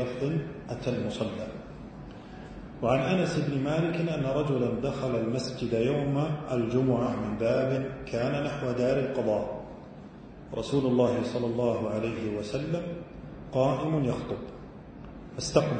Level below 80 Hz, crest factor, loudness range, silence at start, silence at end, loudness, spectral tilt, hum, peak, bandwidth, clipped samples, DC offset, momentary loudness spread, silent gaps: -52 dBFS; 22 dB; 3 LU; 0 s; 0 s; -29 LUFS; -7 dB/octave; none; -8 dBFS; 9.2 kHz; under 0.1%; under 0.1%; 18 LU; none